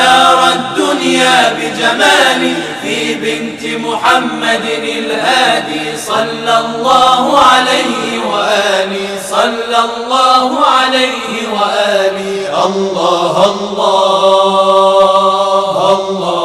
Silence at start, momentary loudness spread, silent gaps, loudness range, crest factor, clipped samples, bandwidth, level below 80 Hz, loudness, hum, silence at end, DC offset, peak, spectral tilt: 0 s; 8 LU; none; 3 LU; 10 dB; 0.3%; 15.5 kHz; -52 dBFS; -11 LUFS; none; 0 s; under 0.1%; 0 dBFS; -2.5 dB/octave